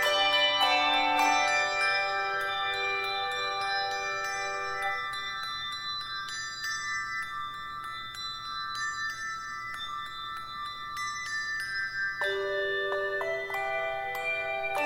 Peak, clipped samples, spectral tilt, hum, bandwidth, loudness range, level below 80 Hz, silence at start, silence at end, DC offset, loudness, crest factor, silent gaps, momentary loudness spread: -12 dBFS; under 0.1%; -1 dB/octave; none; 16 kHz; 8 LU; -62 dBFS; 0 s; 0 s; under 0.1%; -30 LUFS; 18 dB; none; 12 LU